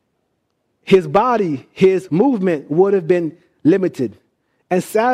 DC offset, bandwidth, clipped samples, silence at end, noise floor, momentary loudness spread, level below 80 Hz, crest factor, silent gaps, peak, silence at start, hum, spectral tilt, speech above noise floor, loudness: under 0.1%; 15 kHz; under 0.1%; 0 s; -69 dBFS; 8 LU; -56 dBFS; 16 dB; none; -2 dBFS; 0.85 s; none; -7 dB/octave; 54 dB; -17 LUFS